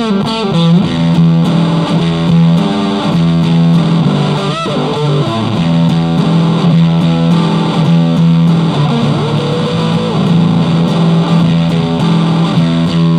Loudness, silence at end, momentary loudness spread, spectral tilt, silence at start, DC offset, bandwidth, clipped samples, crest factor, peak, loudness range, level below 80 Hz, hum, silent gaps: -11 LUFS; 0 s; 4 LU; -7.5 dB/octave; 0 s; under 0.1%; 9.4 kHz; under 0.1%; 10 dB; 0 dBFS; 1 LU; -40 dBFS; none; none